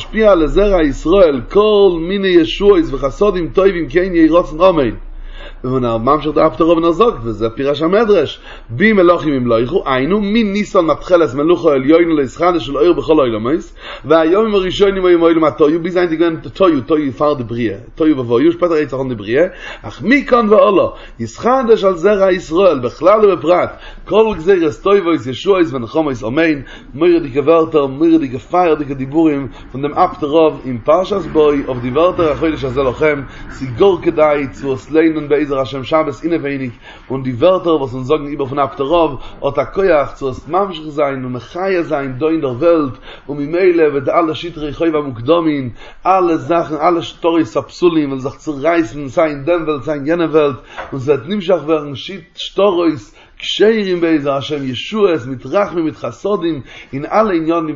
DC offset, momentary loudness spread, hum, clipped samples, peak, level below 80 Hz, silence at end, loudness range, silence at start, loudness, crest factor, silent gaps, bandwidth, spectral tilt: under 0.1%; 11 LU; none; under 0.1%; 0 dBFS; -34 dBFS; 0 s; 4 LU; 0 s; -14 LUFS; 14 dB; none; 7.6 kHz; -7 dB/octave